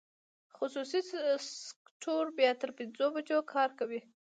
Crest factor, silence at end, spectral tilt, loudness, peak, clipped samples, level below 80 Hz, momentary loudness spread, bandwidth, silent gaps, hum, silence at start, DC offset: 20 dB; 0.35 s; -2.5 dB/octave; -34 LUFS; -14 dBFS; under 0.1%; under -90 dBFS; 13 LU; 9.2 kHz; 1.76-1.85 s, 1.91-2.00 s; none; 0.6 s; under 0.1%